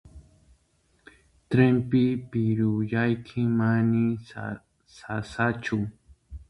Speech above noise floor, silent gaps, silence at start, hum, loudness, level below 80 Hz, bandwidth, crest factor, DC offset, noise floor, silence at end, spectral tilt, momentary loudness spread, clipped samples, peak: 42 dB; none; 0.05 s; none; -26 LUFS; -54 dBFS; 10.5 kHz; 20 dB; under 0.1%; -67 dBFS; 0.05 s; -8.5 dB/octave; 15 LU; under 0.1%; -6 dBFS